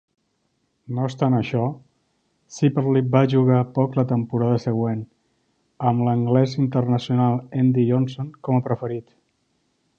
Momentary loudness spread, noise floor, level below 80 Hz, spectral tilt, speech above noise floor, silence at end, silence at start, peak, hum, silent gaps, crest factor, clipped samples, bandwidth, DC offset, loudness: 11 LU; -70 dBFS; -60 dBFS; -8.5 dB/octave; 50 dB; 0.95 s; 0.9 s; -2 dBFS; none; none; 18 dB; under 0.1%; 7.2 kHz; under 0.1%; -21 LUFS